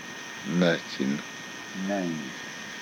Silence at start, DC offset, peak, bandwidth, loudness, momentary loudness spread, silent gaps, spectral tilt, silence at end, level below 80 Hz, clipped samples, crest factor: 0 s; under 0.1%; -10 dBFS; 17.5 kHz; -30 LUFS; 13 LU; none; -5 dB/octave; 0 s; -72 dBFS; under 0.1%; 20 dB